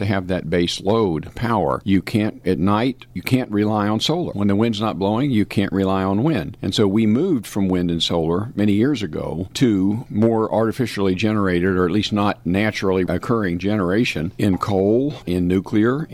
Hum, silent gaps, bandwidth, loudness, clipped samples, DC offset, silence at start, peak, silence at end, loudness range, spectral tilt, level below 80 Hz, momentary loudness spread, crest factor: none; none; 14.5 kHz; -20 LUFS; under 0.1%; under 0.1%; 0 s; -6 dBFS; 0 s; 1 LU; -6.5 dB/octave; -46 dBFS; 4 LU; 14 dB